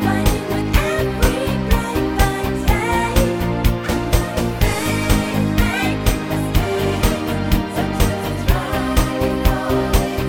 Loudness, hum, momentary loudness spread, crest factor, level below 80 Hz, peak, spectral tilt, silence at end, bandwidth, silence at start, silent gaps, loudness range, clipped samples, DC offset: -19 LUFS; none; 2 LU; 16 dB; -22 dBFS; 0 dBFS; -5.5 dB/octave; 0 s; 17 kHz; 0 s; none; 1 LU; under 0.1%; under 0.1%